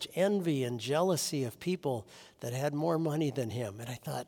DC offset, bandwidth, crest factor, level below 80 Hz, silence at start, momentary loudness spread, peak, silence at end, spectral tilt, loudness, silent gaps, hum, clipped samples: under 0.1%; 18 kHz; 16 dB; -74 dBFS; 0 s; 10 LU; -16 dBFS; 0.05 s; -5.5 dB/octave; -33 LUFS; none; none; under 0.1%